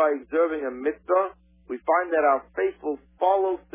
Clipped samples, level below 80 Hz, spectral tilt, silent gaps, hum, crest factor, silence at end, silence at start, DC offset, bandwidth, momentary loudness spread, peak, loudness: under 0.1%; -60 dBFS; -8 dB/octave; none; none; 16 dB; 0.15 s; 0 s; under 0.1%; 3.7 kHz; 10 LU; -8 dBFS; -25 LUFS